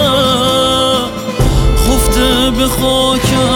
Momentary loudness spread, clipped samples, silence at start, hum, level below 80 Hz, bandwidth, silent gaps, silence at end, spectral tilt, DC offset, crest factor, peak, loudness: 3 LU; under 0.1%; 0 s; none; -18 dBFS; 18 kHz; none; 0 s; -4.5 dB/octave; under 0.1%; 10 dB; 0 dBFS; -11 LUFS